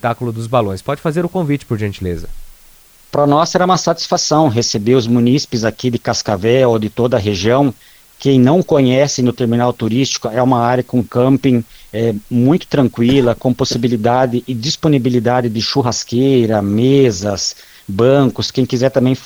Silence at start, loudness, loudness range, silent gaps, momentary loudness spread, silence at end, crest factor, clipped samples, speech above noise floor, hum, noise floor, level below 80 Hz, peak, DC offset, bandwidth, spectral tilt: 0.05 s; -14 LUFS; 2 LU; none; 7 LU; 0 s; 14 dB; under 0.1%; 31 dB; none; -44 dBFS; -42 dBFS; 0 dBFS; under 0.1%; over 20 kHz; -5.5 dB/octave